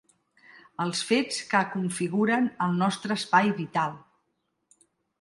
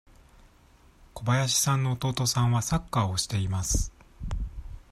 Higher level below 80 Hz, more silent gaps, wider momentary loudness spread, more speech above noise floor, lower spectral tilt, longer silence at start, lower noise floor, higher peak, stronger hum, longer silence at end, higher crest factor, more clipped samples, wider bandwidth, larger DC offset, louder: second, -72 dBFS vs -40 dBFS; neither; second, 7 LU vs 15 LU; first, 51 dB vs 31 dB; about the same, -4.5 dB/octave vs -4 dB/octave; second, 0.8 s vs 1.15 s; first, -77 dBFS vs -57 dBFS; first, -6 dBFS vs -10 dBFS; neither; first, 1.25 s vs 0.15 s; about the same, 22 dB vs 18 dB; neither; second, 11.5 kHz vs 15 kHz; neither; about the same, -26 LUFS vs -27 LUFS